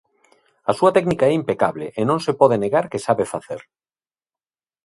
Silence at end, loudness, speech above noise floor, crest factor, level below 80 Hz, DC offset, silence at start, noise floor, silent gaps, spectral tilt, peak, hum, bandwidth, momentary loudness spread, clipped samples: 1.25 s; -19 LUFS; over 71 dB; 20 dB; -58 dBFS; under 0.1%; 0.65 s; under -90 dBFS; none; -6.5 dB/octave; 0 dBFS; none; 11.5 kHz; 10 LU; under 0.1%